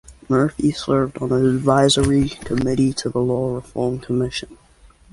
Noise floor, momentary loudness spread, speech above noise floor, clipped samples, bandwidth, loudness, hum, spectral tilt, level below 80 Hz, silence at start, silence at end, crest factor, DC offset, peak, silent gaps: -50 dBFS; 9 LU; 31 dB; under 0.1%; 11.5 kHz; -19 LUFS; none; -5.5 dB/octave; -40 dBFS; 0.1 s; 0.6 s; 18 dB; under 0.1%; -2 dBFS; none